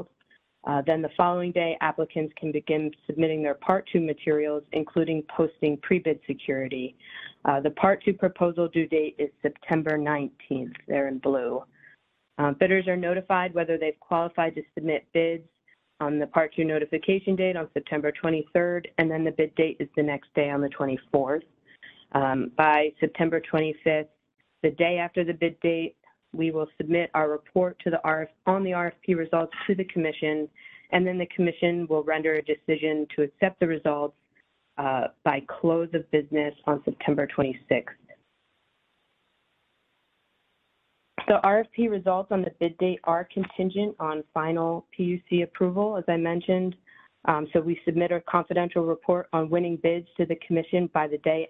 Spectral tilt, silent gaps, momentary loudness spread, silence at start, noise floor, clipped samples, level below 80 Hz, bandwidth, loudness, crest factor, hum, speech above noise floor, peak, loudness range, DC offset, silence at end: -9.5 dB/octave; none; 6 LU; 0 s; -72 dBFS; under 0.1%; -64 dBFS; 4.2 kHz; -26 LUFS; 22 dB; none; 47 dB; -4 dBFS; 2 LU; under 0.1%; 0 s